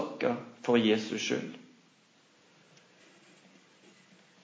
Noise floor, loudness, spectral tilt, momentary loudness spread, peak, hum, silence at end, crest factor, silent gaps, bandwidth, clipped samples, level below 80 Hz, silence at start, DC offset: -64 dBFS; -30 LUFS; -4.5 dB/octave; 15 LU; -12 dBFS; none; 2.8 s; 24 dB; none; 8 kHz; under 0.1%; -82 dBFS; 0 s; under 0.1%